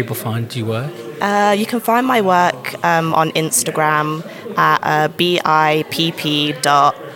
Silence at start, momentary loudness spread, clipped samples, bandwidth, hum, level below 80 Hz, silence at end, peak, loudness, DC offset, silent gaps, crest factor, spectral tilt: 0 s; 8 LU; under 0.1%; 17.5 kHz; none; -64 dBFS; 0 s; 0 dBFS; -16 LUFS; under 0.1%; none; 16 dB; -4 dB/octave